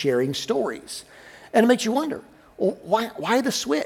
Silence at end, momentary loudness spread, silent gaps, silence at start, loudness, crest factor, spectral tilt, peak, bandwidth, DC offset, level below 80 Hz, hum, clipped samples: 0 s; 15 LU; none; 0 s; -23 LUFS; 18 dB; -4 dB/octave; -4 dBFS; 18 kHz; under 0.1%; -64 dBFS; none; under 0.1%